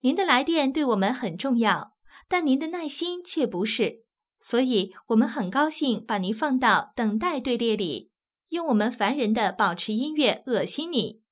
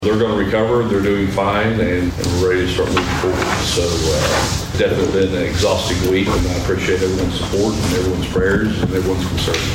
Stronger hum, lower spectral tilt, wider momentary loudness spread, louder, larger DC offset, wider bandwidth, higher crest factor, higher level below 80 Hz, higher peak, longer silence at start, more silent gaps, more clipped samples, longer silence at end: neither; first, -9 dB/octave vs -5 dB/octave; first, 7 LU vs 3 LU; second, -25 LUFS vs -17 LUFS; neither; second, 4 kHz vs 16.5 kHz; first, 20 dB vs 14 dB; second, -66 dBFS vs -30 dBFS; second, -6 dBFS vs -2 dBFS; about the same, 0.05 s vs 0 s; neither; neither; first, 0.2 s vs 0 s